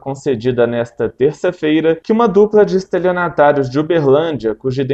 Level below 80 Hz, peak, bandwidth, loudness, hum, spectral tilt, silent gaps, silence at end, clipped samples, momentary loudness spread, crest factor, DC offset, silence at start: -48 dBFS; 0 dBFS; 8 kHz; -14 LUFS; none; -7.5 dB/octave; none; 0 s; under 0.1%; 8 LU; 14 dB; under 0.1%; 0.05 s